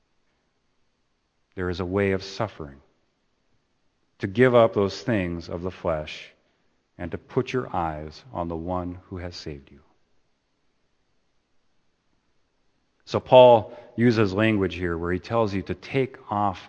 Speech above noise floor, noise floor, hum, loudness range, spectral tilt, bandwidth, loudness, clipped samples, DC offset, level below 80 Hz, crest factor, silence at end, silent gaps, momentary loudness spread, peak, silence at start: 48 dB; -71 dBFS; none; 15 LU; -7 dB/octave; 8.4 kHz; -23 LUFS; under 0.1%; under 0.1%; -52 dBFS; 24 dB; 0 s; none; 19 LU; 0 dBFS; 1.55 s